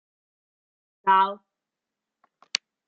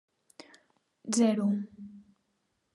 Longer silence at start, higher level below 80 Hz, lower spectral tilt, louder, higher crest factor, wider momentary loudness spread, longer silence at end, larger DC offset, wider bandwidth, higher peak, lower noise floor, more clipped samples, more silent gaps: about the same, 1.05 s vs 1.05 s; about the same, -86 dBFS vs -82 dBFS; second, 0.5 dB/octave vs -5 dB/octave; first, -24 LUFS vs -29 LUFS; first, 26 dB vs 18 dB; second, 11 LU vs 23 LU; first, 1.5 s vs 0.75 s; neither; second, 7.4 kHz vs 11.5 kHz; first, -2 dBFS vs -14 dBFS; first, -87 dBFS vs -78 dBFS; neither; neither